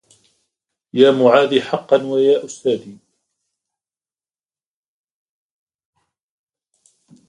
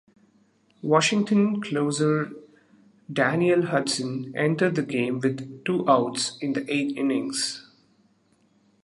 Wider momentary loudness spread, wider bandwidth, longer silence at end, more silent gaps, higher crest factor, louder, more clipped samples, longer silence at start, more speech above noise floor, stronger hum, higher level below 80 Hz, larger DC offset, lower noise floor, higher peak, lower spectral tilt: about the same, 10 LU vs 8 LU; second, 10 kHz vs 11.5 kHz; first, 4.35 s vs 1.25 s; neither; about the same, 20 dB vs 20 dB; first, -16 LUFS vs -24 LUFS; neither; about the same, 0.95 s vs 0.85 s; first, over 75 dB vs 40 dB; neither; about the same, -68 dBFS vs -72 dBFS; neither; first, under -90 dBFS vs -64 dBFS; first, 0 dBFS vs -4 dBFS; about the same, -5 dB/octave vs -5 dB/octave